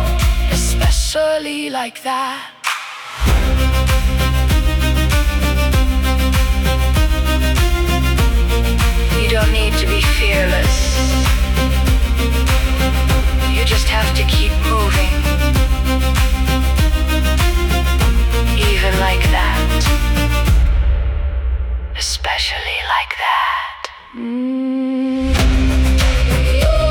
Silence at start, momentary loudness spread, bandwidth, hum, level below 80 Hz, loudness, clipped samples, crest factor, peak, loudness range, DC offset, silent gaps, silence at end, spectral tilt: 0 s; 6 LU; 19 kHz; none; -16 dBFS; -16 LUFS; under 0.1%; 12 dB; -4 dBFS; 3 LU; under 0.1%; none; 0 s; -4.5 dB/octave